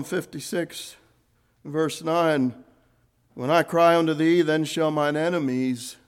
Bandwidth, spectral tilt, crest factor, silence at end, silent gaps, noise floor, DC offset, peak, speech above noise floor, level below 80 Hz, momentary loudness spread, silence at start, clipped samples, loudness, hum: 16 kHz; -5.5 dB/octave; 18 dB; 0.15 s; none; -65 dBFS; under 0.1%; -6 dBFS; 42 dB; -70 dBFS; 12 LU; 0 s; under 0.1%; -23 LUFS; none